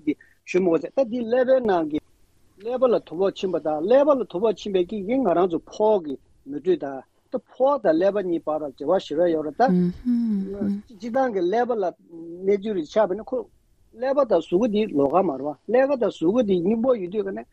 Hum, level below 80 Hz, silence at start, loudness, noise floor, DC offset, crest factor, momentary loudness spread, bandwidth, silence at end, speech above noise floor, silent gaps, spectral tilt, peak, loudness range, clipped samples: none; -58 dBFS; 0.05 s; -23 LUFS; -59 dBFS; under 0.1%; 16 dB; 11 LU; 8 kHz; 0.1 s; 37 dB; none; -7.5 dB/octave; -6 dBFS; 3 LU; under 0.1%